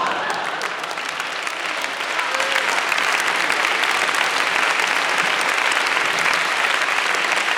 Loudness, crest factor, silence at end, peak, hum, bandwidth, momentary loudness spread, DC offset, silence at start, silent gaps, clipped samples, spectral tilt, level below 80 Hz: -19 LUFS; 18 dB; 0 s; -4 dBFS; none; over 20 kHz; 7 LU; under 0.1%; 0 s; none; under 0.1%; 0 dB/octave; -68 dBFS